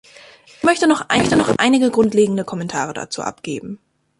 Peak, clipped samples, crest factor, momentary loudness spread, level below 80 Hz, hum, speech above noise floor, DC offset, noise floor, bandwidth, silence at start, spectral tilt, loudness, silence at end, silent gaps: -2 dBFS; under 0.1%; 16 dB; 13 LU; -50 dBFS; none; 27 dB; under 0.1%; -45 dBFS; 11.5 kHz; 0.65 s; -4.5 dB/octave; -17 LUFS; 0.45 s; none